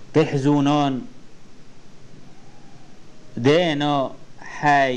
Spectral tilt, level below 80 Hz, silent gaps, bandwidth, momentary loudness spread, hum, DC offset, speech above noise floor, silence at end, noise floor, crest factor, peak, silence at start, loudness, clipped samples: -6 dB/octave; -50 dBFS; none; 9 kHz; 20 LU; none; 1%; 24 dB; 0 s; -42 dBFS; 16 dB; -6 dBFS; 0 s; -20 LUFS; under 0.1%